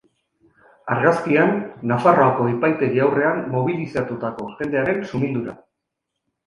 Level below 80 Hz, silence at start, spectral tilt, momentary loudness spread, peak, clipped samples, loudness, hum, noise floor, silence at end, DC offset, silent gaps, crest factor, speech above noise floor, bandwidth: -58 dBFS; 0.85 s; -8.5 dB/octave; 11 LU; -2 dBFS; under 0.1%; -20 LUFS; none; -80 dBFS; 0.9 s; under 0.1%; none; 18 dB; 60 dB; 11 kHz